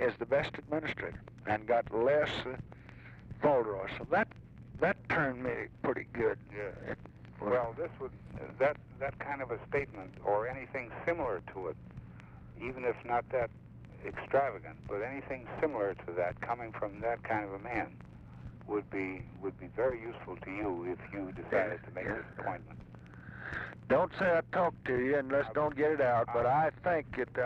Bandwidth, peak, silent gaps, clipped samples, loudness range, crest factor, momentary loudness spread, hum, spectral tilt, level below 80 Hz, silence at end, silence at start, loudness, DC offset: 8 kHz; -18 dBFS; none; under 0.1%; 7 LU; 16 dB; 17 LU; none; -7.5 dB/octave; -58 dBFS; 0 s; 0 s; -35 LUFS; under 0.1%